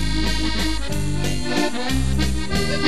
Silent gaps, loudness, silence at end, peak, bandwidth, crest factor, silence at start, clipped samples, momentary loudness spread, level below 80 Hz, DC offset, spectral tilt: none; -23 LUFS; 0 s; -6 dBFS; 14 kHz; 16 dB; 0 s; under 0.1%; 2 LU; -26 dBFS; 6%; -4.5 dB/octave